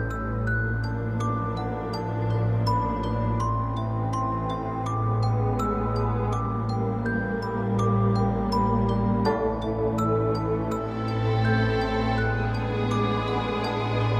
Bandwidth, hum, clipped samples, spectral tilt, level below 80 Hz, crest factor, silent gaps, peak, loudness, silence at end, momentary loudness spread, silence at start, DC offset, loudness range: 7.6 kHz; none; under 0.1%; -8 dB/octave; -38 dBFS; 14 dB; none; -12 dBFS; -26 LUFS; 0 s; 5 LU; 0 s; under 0.1%; 2 LU